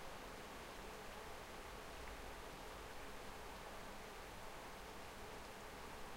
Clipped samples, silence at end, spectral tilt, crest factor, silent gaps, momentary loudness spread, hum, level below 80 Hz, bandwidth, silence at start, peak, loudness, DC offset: under 0.1%; 0 s; -3.5 dB/octave; 14 dB; none; 1 LU; none; -60 dBFS; 16 kHz; 0 s; -38 dBFS; -53 LUFS; under 0.1%